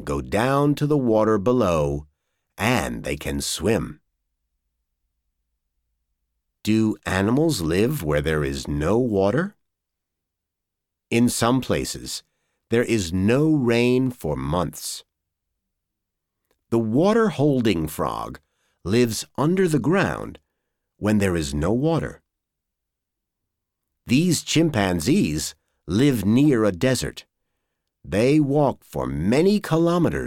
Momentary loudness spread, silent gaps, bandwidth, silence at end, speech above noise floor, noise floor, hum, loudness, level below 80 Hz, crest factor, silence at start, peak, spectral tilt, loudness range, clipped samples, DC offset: 9 LU; none; 18 kHz; 0 s; 63 dB; -83 dBFS; none; -22 LUFS; -44 dBFS; 18 dB; 0 s; -4 dBFS; -5.5 dB/octave; 6 LU; under 0.1%; under 0.1%